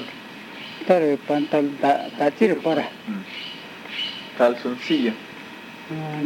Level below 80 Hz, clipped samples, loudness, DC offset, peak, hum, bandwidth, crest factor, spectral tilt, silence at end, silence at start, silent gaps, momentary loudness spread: -74 dBFS; under 0.1%; -23 LUFS; under 0.1%; -4 dBFS; none; 17 kHz; 20 dB; -6 dB/octave; 0 s; 0 s; none; 17 LU